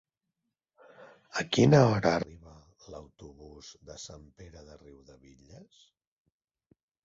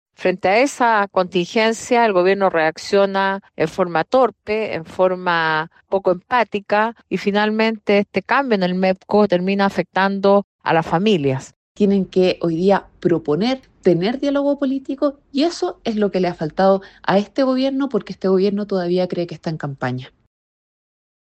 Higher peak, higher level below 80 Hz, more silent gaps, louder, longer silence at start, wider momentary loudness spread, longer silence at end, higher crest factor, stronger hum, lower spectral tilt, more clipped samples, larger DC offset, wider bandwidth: second, -8 dBFS vs -2 dBFS; about the same, -60 dBFS vs -56 dBFS; second, none vs 10.44-10.59 s, 11.56-11.75 s; second, -25 LUFS vs -18 LUFS; first, 1.35 s vs 0.2 s; first, 29 LU vs 7 LU; first, 2.6 s vs 1.2 s; first, 24 dB vs 16 dB; neither; about the same, -6 dB/octave vs -6 dB/octave; neither; neither; second, 7.8 kHz vs 9.2 kHz